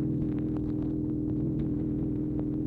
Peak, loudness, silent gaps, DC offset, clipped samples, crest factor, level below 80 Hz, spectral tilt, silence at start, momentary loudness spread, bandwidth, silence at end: -18 dBFS; -31 LUFS; none; under 0.1%; under 0.1%; 10 dB; -42 dBFS; -12 dB/octave; 0 s; 1 LU; 3.9 kHz; 0 s